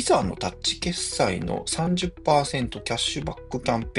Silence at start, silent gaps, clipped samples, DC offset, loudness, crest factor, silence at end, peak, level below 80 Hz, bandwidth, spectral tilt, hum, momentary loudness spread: 0 s; none; under 0.1%; under 0.1%; -25 LUFS; 20 dB; 0 s; -6 dBFS; -42 dBFS; 11.5 kHz; -4 dB/octave; none; 6 LU